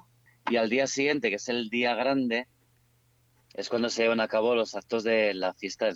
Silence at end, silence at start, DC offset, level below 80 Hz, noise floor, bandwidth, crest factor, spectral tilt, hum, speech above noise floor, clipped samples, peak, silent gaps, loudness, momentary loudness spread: 0 s; 0.45 s; under 0.1%; -74 dBFS; -66 dBFS; 8.2 kHz; 16 dB; -3.5 dB/octave; none; 39 dB; under 0.1%; -12 dBFS; none; -27 LUFS; 7 LU